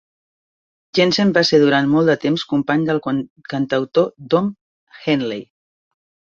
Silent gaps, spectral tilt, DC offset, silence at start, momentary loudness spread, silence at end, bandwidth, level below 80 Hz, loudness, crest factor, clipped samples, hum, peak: 3.30-3.36 s, 4.61-4.87 s; -6 dB/octave; under 0.1%; 0.95 s; 12 LU; 0.9 s; 7.4 kHz; -60 dBFS; -18 LUFS; 16 dB; under 0.1%; none; -2 dBFS